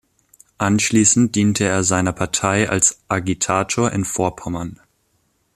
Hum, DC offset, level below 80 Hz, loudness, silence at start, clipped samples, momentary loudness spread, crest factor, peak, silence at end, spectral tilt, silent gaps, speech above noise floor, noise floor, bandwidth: none; under 0.1%; -48 dBFS; -18 LUFS; 0.6 s; under 0.1%; 9 LU; 18 dB; -2 dBFS; 0.8 s; -4 dB/octave; none; 47 dB; -65 dBFS; 14 kHz